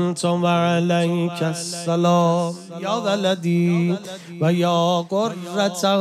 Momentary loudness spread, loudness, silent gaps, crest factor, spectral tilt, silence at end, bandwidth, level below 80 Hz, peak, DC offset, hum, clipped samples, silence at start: 7 LU; -20 LUFS; none; 14 dB; -6 dB/octave; 0 s; 13.5 kHz; -74 dBFS; -6 dBFS; under 0.1%; none; under 0.1%; 0 s